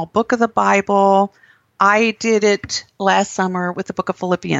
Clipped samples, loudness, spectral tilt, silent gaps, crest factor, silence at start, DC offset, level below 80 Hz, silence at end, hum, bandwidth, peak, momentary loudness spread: under 0.1%; -17 LUFS; -4.5 dB/octave; none; 16 dB; 0 s; under 0.1%; -56 dBFS; 0 s; none; 8.2 kHz; -2 dBFS; 9 LU